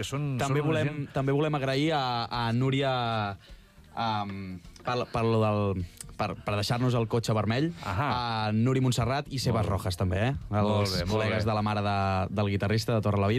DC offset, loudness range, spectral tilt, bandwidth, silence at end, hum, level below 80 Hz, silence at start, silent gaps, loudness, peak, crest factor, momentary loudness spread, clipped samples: under 0.1%; 3 LU; -6 dB/octave; 14.5 kHz; 0 s; none; -50 dBFS; 0 s; none; -28 LUFS; -16 dBFS; 12 dB; 7 LU; under 0.1%